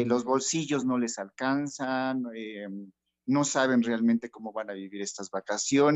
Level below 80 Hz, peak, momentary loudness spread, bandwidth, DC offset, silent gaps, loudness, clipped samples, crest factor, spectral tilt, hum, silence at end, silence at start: -76 dBFS; -12 dBFS; 13 LU; 8.6 kHz; under 0.1%; none; -29 LUFS; under 0.1%; 16 dB; -4 dB/octave; none; 0 s; 0 s